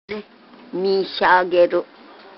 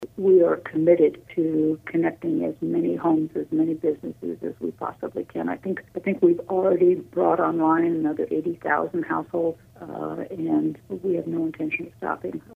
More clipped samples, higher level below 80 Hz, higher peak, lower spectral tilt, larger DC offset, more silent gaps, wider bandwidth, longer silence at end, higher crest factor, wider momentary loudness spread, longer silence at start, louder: neither; about the same, -62 dBFS vs -64 dBFS; first, -2 dBFS vs -6 dBFS; second, -7.5 dB/octave vs -9.5 dB/octave; neither; neither; first, 5.8 kHz vs 3.7 kHz; first, 0.55 s vs 0.15 s; about the same, 18 dB vs 18 dB; first, 18 LU vs 12 LU; about the same, 0.1 s vs 0 s; first, -18 LUFS vs -24 LUFS